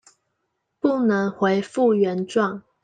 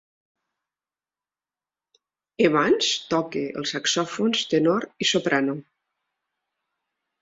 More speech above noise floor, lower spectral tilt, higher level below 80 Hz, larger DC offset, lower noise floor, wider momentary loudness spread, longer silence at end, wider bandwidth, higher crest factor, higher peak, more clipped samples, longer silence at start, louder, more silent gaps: second, 55 dB vs over 67 dB; first, -7 dB/octave vs -3.5 dB/octave; about the same, -68 dBFS vs -68 dBFS; neither; second, -76 dBFS vs under -90 dBFS; second, 5 LU vs 8 LU; second, 0.25 s vs 1.6 s; first, 9.4 kHz vs 7.8 kHz; about the same, 16 dB vs 20 dB; about the same, -6 dBFS vs -6 dBFS; neither; second, 0.85 s vs 2.4 s; about the same, -22 LUFS vs -23 LUFS; neither